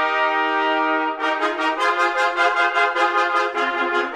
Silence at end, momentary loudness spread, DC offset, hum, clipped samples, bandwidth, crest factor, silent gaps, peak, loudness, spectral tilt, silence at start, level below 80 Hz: 0 s; 3 LU; under 0.1%; none; under 0.1%; 12.5 kHz; 14 dB; none; -6 dBFS; -19 LUFS; -1 dB/octave; 0 s; -64 dBFS